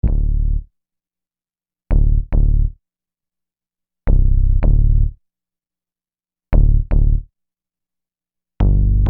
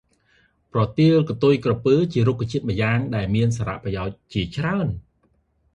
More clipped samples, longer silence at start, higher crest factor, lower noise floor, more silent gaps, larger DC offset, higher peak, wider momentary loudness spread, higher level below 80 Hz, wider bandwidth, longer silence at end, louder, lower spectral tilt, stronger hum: neither; second, 0.05 s vs 0.75 s; about the same, 16 dB vs 16 dB; first, under -90 dBFS vs -65 dBFS; neither; neither; first, 0 dBFS vs -6 dBFS; about the same, 8 LU vs 10 LU; first, -16 dBFS vs -44 dBFS; second, 2.5 kHz vs 8.8 kHz; second, 0 s vs 0.75 s; first, -19 LUFS vs -22 LUFS; first, -12 dB/octave vs -7.5 dB/octave; first, 60 Hz at -50 dBFS vs none